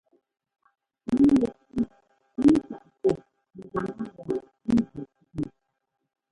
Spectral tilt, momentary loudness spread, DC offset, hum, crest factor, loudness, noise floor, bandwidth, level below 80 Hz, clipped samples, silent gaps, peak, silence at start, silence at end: -8 dB/octave; 18 LU; under 0.1%; none; 20 dB; -26 LUFS; -62 dBFS; 11 kHz; -54 dBFS; under 0.1%; none; -8 dBFS; 1.1 s; 0.85 s